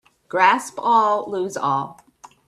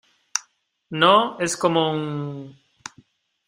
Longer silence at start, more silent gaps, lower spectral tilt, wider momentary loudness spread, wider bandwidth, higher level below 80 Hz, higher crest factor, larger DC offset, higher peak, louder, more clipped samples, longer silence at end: about the same, 0.35 s vs 0.35 s; neither; about the same, -4 dB/octave vs -3.5 dB/octave; second, 10 LU vs 24 LU; second, 13.5 kHz vs 15 kHz; about the same, -68 dBFS vs -66 dBFS; about the same, 20 dB vs 22 dB; neither; about the same, -2 dBFS vs -2 dBFS; about the same, -20 LUFS vs -21 LUFS; neither; second, 0.55 s vs 0.95 s